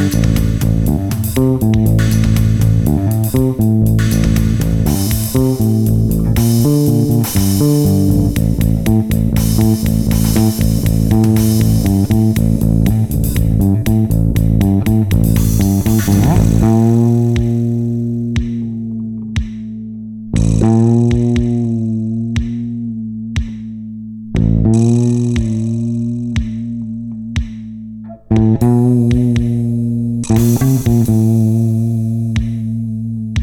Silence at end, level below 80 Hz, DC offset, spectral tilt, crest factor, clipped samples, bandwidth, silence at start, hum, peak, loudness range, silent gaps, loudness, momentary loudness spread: 0 s; -24 dBFS; under 0.1%; -7 dB/octave; 10 dB; under 0.1%; 17.5 kHz; 0 s; none; -2 dBFS; 4 LU; none; -14 LUFS; 10 LU